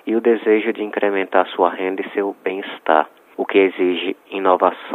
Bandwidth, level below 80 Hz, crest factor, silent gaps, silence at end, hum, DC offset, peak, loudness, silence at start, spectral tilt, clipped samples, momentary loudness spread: 4.1 kHz; -72 dBFS; 18 dB; none; 0 s; none; under 0.1%; 0 dBFS; -19 LUFS; 0.05 s; -7 dB/octave; under 0.1%; 9 LU